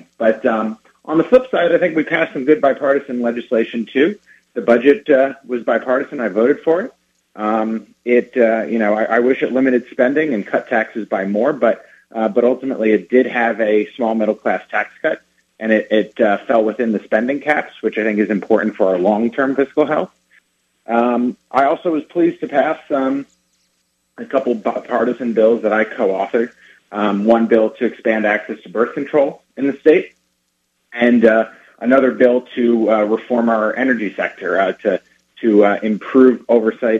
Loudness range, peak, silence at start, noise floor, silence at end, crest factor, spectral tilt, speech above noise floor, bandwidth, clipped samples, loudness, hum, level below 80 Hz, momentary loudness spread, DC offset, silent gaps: 3 LU; 0 dBFS; 0.2 s; -68 dBFS; 0 s; 16 dB; -7.5 dB/octave; 52 dB; 7.6 kHz; under 0.1%; -16 LUFS; none; -64 dBFS; 8 LU; under 0.1%; none